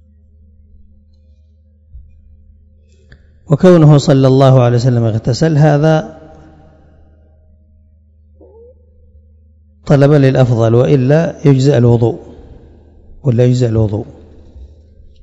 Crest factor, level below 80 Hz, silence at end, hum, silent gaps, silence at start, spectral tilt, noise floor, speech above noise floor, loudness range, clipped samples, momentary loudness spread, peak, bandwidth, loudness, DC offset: 14 dB; -40 dBFS; 0.55 s; none; none; 1.95 s; -8 dB/octave; -47 dBFS; 38 dB; 8 LU; 0.7%; 10 LU; 0 dBFS; 7.8 kHz; -10 LUFS; under 0.1%